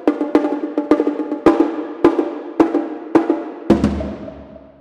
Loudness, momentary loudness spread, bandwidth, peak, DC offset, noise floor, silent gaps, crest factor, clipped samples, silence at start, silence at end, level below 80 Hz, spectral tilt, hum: -18 LUFS; 9 LU; 9 kHz; -2 dBFS; under 0.1%; -38 dBFS; none; 16 dB; under 0.1%; 0 s; 0.25 s; -38 dBFS; -8 dB/octave; none